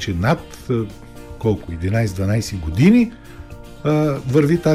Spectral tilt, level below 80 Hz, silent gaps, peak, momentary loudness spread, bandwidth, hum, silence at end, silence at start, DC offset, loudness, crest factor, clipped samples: -7 dB/octave; -38 dBFS; none; -2 dBFS; 24 LU; 15 kHz; none; 0 s; 0 s; under 0.1%; -19 LUFS; 16 dB; under 0.1%